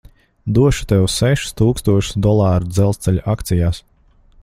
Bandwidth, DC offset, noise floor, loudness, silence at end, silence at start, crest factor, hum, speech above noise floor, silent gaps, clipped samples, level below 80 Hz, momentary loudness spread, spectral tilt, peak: 16 kHz; under 0.1%; -50 dBFS; -16 LUFS; 0.65 s; 0.45 s; 16 dB; none; 34 dB; none; under 0.1%; -32 dBFS; 5 LU; -6 dB/octave; 0 dBFS